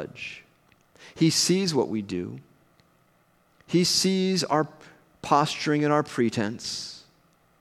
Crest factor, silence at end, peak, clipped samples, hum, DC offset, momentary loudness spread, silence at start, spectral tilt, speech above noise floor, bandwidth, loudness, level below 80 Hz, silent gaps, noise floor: 22 dB; 0.6 s; -6 dBFS; under 0.1%; none; under 0.1%; 17 LU; 0 s; -4 dB/octave; 39 dB; 15 kHz; -25 LUFS; -68 dBFS; none; -64 dBFS